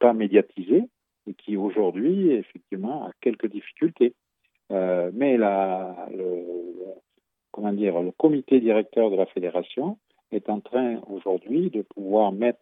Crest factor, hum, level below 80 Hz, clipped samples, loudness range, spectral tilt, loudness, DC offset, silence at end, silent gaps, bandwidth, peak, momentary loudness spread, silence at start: 20 dB; none; -84 dBFS; under 0.1%; 3 LU; -10.5 dB/octave; -24 LUFS; under 0.1%; 0.1 s; none; 3.9 kHz; -4 dBFS; 13 LU; 0 s